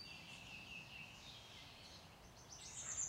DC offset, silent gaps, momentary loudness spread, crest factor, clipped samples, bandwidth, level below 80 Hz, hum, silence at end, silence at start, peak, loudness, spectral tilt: under 0.1%; none; 8 LU; 24 dB; under 0.1%; 16 kHz; -72 dBFS; none; 0 s; 0 s; -30 dBFS; -53 LUFS; -1 dB/octave